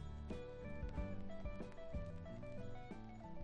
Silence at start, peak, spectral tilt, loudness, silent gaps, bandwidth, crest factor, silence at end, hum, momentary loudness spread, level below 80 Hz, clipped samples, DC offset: 0 s; -32 dBFS; -8 dB/octave; -51 LUFS; none; 8.4 kHz; 14 dB; 0 s; none; 6 LU; -52 dBFS; under 0.1%; under 0.1%